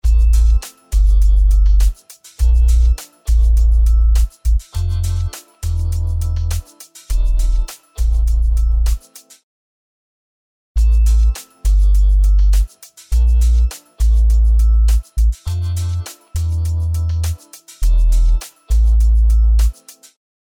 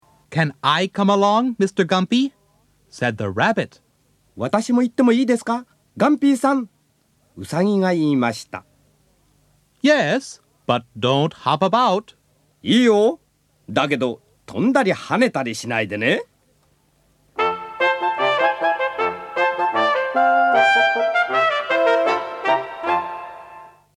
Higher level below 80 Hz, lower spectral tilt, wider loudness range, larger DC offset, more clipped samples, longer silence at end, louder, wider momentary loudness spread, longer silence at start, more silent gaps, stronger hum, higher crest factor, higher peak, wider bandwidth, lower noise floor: first, -14 dBFS vs -64 dBFS; about the same, -5 dB/octave vs -5.5 dB/octave; about the same, 5 LU vs 5 LU; neither; neither; first, 0.7 s vs 0.3 s; about the same, -17 LUFS vs -19 LUFS; about the same, 9 LU vs 11 LU; second, 0.05 s vs 0.3 s; first, 9.44-10.75 s vs none; neither; second, 10 dB vs 18 dB; about the same, -4 dBFS vs -2 dBFS; about the same, 12.5 kHz vs 13 kHz; second, -40 dBFS vs -62 dBFS